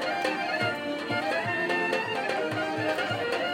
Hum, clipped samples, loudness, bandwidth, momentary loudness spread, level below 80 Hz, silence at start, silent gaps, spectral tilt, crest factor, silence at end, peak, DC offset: none; under 0.1%; -28 LUFS; 16.5 kHz; 3 LU; -70 dBFS; 0 s; none; -4.5 dB/octave; 16 dB; 0 s; -14 dBFS; under 0.1%